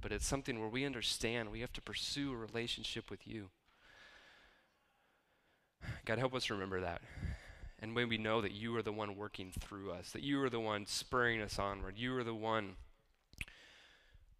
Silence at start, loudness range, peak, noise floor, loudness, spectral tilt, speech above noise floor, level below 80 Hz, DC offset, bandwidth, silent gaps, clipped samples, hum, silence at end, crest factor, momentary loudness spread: 0 s; 7 LU; -20 dBFS; -77 dBFS; -40 LUFS; -4 dB/octave; 36 dB; -56 dBFS; under 0.1%; 15.5 kHz; none; under 0.1%; none; 0.1 s; 22 dB; 14 LU